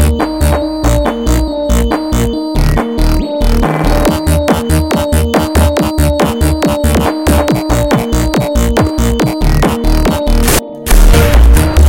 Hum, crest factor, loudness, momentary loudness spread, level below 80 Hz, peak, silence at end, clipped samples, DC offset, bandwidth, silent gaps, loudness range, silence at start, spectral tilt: none; 10 dB; -12 LUFS; 5 LU; -12 dBFS; 0 dBFS; 0 s; 0.2%; under 0.1%; 17 kHz; none; 2 LU; 0 s; -5.5 dB/octave